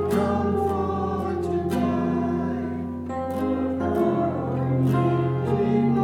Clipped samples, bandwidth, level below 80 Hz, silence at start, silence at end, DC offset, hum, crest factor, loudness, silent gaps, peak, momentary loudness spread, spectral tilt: under 0.1%; 15.5 kHz; -48 dBFS; 0 s; 0 s; under 0.1%; none; 14 dB; -24 LUFS; none; -10 dBFS; 7 LU; -9 dB/octave